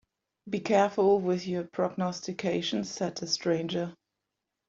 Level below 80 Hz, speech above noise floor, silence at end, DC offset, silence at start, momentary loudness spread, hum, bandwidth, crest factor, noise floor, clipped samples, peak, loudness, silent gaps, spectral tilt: -70 dBFS; 57 dB; 0.75 s; under 0.1%; 0.45 s; 9 LU; none; 7.8 kHz; 18 dB; -85 dBFS; under 0.1%; -12 dBFS; -29 LUFS; none; -5 dB/octave